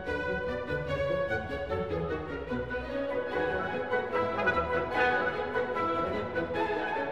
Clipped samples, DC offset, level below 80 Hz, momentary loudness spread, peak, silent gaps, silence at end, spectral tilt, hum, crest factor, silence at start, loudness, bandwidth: under 0.1%; 0.2%; -50 dBFS; 6 LU; -16 dBFS; none; 0 s; -6.5 dB/octave; none; 16 dB; 0 s; -31 LUFS; 9.4 kHz